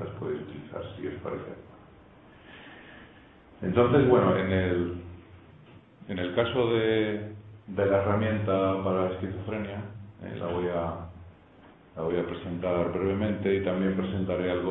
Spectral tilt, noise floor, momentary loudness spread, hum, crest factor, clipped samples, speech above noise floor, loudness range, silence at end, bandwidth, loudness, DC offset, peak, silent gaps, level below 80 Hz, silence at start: -11 dB/octave; -54 dBFS; 20 LU; none; 20 dB; under 0.1%; 27 dB; 7 LU; 0 s; 4 kHz; -28 LUFS; under 0.1%; -8 dBFS; none; -56 dBFS; 0 s